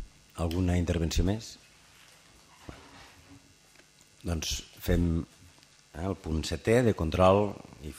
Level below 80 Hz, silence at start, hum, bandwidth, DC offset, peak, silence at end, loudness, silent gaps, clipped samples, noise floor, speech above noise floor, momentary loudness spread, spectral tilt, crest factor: -40 dBFS; 0 s; none; 15.5 kHz; under 0.1%; -8 dBFS; 0 s; -29 LUFS; none; under 0.1%; -59 dBFS; 31 dB; 24 LU; -6 dB/octave; 22 dB